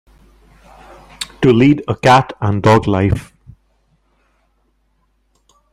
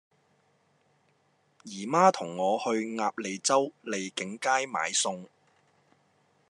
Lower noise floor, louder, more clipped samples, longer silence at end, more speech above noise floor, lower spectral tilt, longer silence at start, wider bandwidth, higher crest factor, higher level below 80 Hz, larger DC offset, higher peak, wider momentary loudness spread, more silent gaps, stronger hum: second, -61 dBFS vs -69 dBFS; first, -13 LUFS vs -28 LUFS; neither; first, 2.5 s vs 1.25 s; first, 49 dB vs 41 dB; first, -6.5 dB/octave vs -3 dB/octave; second, 1.2 s vs 1.65 s; first, 13.5 kHz vs 11.5 kHz; second, 16 dB vs 24 dB; first, -42 dBFS vs -88 dBFS; neither; first, 0 dBFS vs -8 dBFS; about the same, 11 LU vs 12 LU; neither; neither